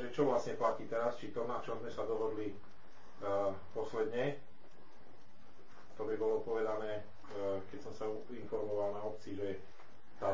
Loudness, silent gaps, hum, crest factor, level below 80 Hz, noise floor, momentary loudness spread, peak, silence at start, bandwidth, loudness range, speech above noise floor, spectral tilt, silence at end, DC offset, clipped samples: -39 LUFS; none; none; 20 dB; -70 dBFS; -62 dBFS; 10 LU; -20 dBFS; 0 s; 7.6 kHz; 3 LU; 24 dB; -6.5 dB/octave; 0 s; 0.9%; under 0.1%